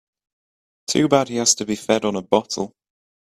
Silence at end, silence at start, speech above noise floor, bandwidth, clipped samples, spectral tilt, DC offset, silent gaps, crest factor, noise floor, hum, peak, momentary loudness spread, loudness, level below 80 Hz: 0.55 s; 0.9 s; over 70 dB; 15 kHz; under 0.1%; -3.5 dB/octave; under 0.1%; none; 20 dB; under -90 dBFS; none; -2 dBFS; 11 LU; -20 LUFS; -60 dBFS